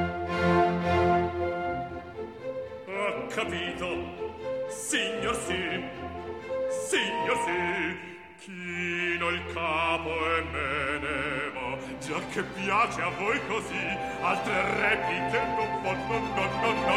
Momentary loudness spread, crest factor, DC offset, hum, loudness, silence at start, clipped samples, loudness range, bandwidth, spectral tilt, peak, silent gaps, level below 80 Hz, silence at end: 12 LU; 18 dB; under 0.1%; none; -29 LUFS; 0 s; under 0.1%; 4 LU; 16 kHz; -4.5 dB/octave; -12 dBFS; none; -52 dBFS; 0 s